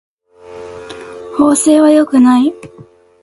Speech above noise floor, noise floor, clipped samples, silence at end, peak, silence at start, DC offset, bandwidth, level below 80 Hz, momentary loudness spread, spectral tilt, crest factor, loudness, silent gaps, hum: 25 dB; -35 dBFS; under 0.1%; 0.55 s; 0 dBFS; 0.5 s; under 0.1%; 11.5 kHz; -52 dBFS; 22 LU; -4 dB/octave; 12 dB; -10 LUFS; none; none